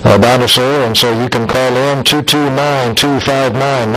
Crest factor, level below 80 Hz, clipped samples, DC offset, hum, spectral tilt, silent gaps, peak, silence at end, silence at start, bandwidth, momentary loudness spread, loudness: 10 dB; -40 dBFS; 0.3%; under 0.1%; none; -4.5 dB/octave; none; 0 dBFS; 0 s; 0 s; 16 kHz; 5 LU; -11 LUFS